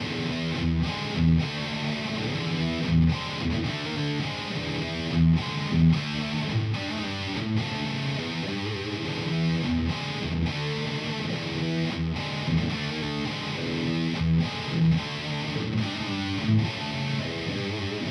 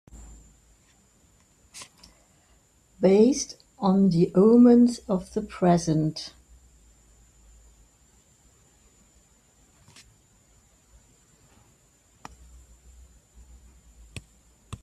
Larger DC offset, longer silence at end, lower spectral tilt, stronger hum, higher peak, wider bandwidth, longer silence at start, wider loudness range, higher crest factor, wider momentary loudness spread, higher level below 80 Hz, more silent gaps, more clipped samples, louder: neither; about the same, 0 s vs 0.05 s; about the same, -6 dB/octave vs -7 dB/octave; neither; about the same, -10 dBFS vs -8 dBFS; about the same, 10.5 kHz vs 11 kHz; second, 0 s vs 1.75 s; second, 2 LU vs 9 LU; about the same, 16 dB vs 18 dB; second, 7 LU vs 29 LU; first, -42 dBFS vs -56 dBFS; neither; neither; second, -27 LUFS vs -21 LUFS